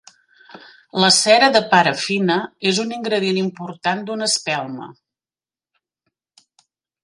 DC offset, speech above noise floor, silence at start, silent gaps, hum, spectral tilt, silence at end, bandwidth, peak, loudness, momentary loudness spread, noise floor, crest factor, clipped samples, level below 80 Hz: under 0.1%; over 72 dB; 0.55 s; none; none; -3 dB/octave; 2.1 s; 11.5 kHz; 0 dBFS; -17 LUFS; 12 LU; under -90 dBFS; 20 dB; under 0.1%; -66 dBFS